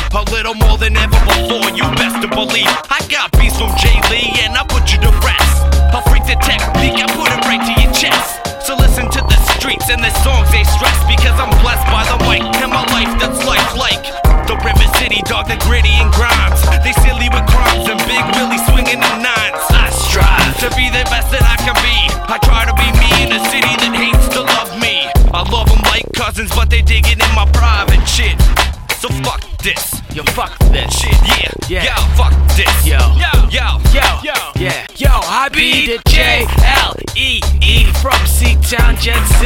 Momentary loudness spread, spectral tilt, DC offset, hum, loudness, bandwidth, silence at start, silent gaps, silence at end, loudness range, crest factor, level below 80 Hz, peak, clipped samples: 5 LU; -3.5 dB/octave; under 0.1%; none; -12 LUFS; 17 kHz; 0 s; none; 0 s; 1 LU; 10 dB; -12 dBFS; 0 dBFS; under 0.1%